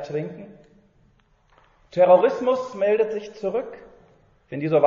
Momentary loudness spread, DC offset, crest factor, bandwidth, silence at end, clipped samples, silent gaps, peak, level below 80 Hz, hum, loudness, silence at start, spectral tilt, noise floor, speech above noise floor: 20 LU; under 0.1%; 18 dB; 7.2 kHz; 0 s; under 0.1%; none; -4 dBFS; -64 dBFS; none; -22 LUFS; 0 s; -5.5 dB/octave; -60 dBFS; 39 dB